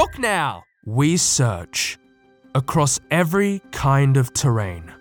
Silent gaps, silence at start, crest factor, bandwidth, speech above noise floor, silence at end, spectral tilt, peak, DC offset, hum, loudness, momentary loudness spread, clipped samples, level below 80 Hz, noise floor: none; 0 s; 16 dB; 19 kHz; 34 dB; 0.05 s; -4.5 dB/octave; -4 dBFS; under 0.1%; none; -20 LUFS; 9 LU; under 0.1%; -44 dBFS; -53 dBFS